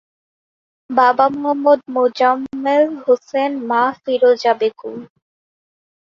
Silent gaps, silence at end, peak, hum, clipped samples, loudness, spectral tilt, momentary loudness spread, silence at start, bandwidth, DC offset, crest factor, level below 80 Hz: none; 1 s; 0 dBFS; none; under 0.1%; -16 LUFS; -5 dB/octave; 7 LU; 0.9 s; 7.2 kHz; under 0.1%; 16 dB; -66 dBFS